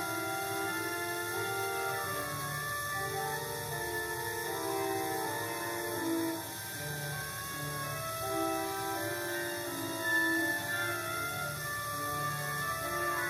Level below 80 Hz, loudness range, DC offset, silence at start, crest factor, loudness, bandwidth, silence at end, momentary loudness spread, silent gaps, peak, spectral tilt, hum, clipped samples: -62 dBFS; 3 LU; under 0.1%; 0 s; 16 dB; -34 LUFS; 17 kHz; 0 s; 5 LU; none; -20 dBFS; -3 dB/octave; none; under 0.1%